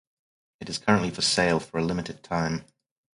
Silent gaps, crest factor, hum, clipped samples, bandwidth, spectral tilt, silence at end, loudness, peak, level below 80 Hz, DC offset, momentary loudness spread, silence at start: none; 22 dB; none; under 0.1%; 11.5 kHz; -4 dB/octave; 0.55 s; -26 LUFS; -4 dBFS; -54 dBFS; under 0.1%; 12 LU; 0.6 s